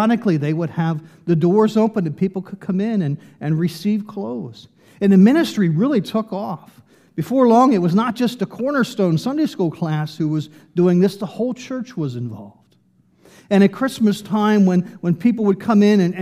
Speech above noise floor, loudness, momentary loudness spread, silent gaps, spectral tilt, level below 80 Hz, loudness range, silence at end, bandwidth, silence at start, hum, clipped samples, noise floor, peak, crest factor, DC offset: 40 dB; -18 LUFS; 13 LU; none; -7.5 dB/octave; -66 dBFS; 5 LU; 0 s; 14 kHz; 0 s; none; under 0.1%; -57 dBFS; -2 dBFS; 16 dB; under 0.1%